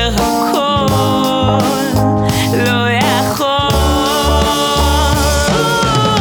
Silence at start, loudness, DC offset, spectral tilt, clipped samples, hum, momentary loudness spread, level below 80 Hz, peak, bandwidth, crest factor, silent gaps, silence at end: 0 s; -13 LUFS; under 0.1%; -4.5 dB/octave; under 0.1%; none; 2 LU; -22 dBFS; 0 dBFS; over 20 kHz; 12 dB; none; 0 s